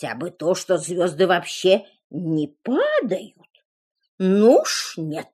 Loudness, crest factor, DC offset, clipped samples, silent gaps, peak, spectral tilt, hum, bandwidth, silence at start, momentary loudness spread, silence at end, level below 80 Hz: -21 LUFS; 18 dB; under 0.1%; under 0.1%; 2.04-2.10 s, 3.50-3.54 s, 3.65-3.95 s, 4.08-4.18 s; -4 dBFS; -4.5 dB/octave; none; 13.5 kHz; 0 s; 13 LU; 0.1 s; -76 dBFS